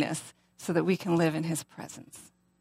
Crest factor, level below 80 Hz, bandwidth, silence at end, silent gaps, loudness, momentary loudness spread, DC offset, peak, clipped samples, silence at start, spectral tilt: 18 dB; -72 dBFS; 16 kHz; 0.35 s; none; -30 LUFS; 22 LU; under 0.1%; -12 dBFS; under 0.1%; 0 s; -5.5 dB/octave